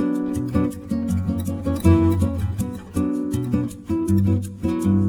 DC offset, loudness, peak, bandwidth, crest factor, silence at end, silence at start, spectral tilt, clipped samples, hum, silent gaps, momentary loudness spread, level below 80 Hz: under 0.1%; -22 LUFS; -2 dBFS; 18.5 kHz; 18 dB; 0 s; 0 s; -8 dB/octave; under 0.1%; none; none; 8 LU; -36 dBFS